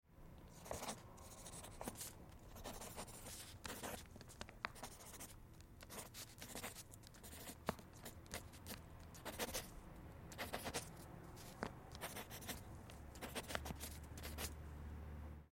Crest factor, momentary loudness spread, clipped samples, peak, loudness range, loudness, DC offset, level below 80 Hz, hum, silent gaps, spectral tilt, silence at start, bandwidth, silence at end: 32 dB; 11 LU; under 0.1%; -22 dBFS; 3 LU; -52 LUFS; under 0.1%; -62 dBFS; none; none; -3.5 dB/octave; 0.05 s; 16.5 kHz; 0.05 s